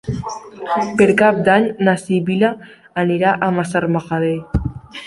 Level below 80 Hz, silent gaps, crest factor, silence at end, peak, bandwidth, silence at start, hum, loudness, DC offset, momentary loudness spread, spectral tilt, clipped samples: -36 dBFS; none; 16 dB; 0 s; 0 dBFS; 11.5 kHz; 0.05 s; none; -17 LUFS; under 0.1%; 14 LU; -6.5 dB/octave; under 0.1%